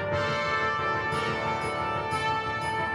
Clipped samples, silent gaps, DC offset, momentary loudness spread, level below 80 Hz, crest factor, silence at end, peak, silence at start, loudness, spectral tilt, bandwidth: under 0.1%; none; under 0.1%; 3 LU; -52 dBFS; 12 dB; 0 s; -16 dBFS; 0 s; -28 LUFS; -4.5 dB/octave; 15.5 kHz